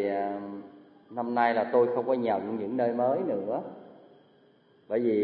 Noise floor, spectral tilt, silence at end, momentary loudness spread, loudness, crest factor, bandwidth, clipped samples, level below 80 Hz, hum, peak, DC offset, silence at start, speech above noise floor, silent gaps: -61 dBFS; -10.5 dB/octave; 0 s; 16 LU; -28 LUFS; 18 dB; 4.7 kHz; under 0.1%; -82 dBFS; none; -10 dBFS; under 0.1%; 0 s; 34 dB; none